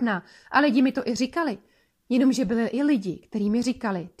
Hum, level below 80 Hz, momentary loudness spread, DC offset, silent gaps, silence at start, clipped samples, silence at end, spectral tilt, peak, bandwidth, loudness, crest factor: none; -60 dBFS; 9 LU; under 0.1%; none; 0 s; under 0.1%; 0.1 s; -5.5 dB/octave; -6 dBFS; 12.5 kHz; -24 LUFS; 18 dB